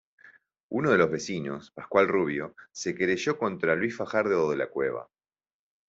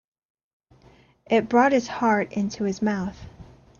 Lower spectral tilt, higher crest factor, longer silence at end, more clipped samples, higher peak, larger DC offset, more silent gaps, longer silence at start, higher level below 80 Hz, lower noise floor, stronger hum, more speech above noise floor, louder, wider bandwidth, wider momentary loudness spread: about the same, -5.5 dB/octave vs -6 dB/octave; about the same, 20 dB vs 18 dB; first, 0.85 s vs 0.35 s; neither; about the same, -8 dBFS vs -6 dBFS; neither; neither; second, 0.7 s vs 1.3 s; second, -68 dBFS vs -56 dBFS; about the same, -58 dBFS vs -55 dBFS; neither; about the same, 31 dB vs 33 dB; second, -27 LUFS vs -23 LUFS; first, 8 kHz vs 7.2 kHz; about the same, 11 LU vs 11 LU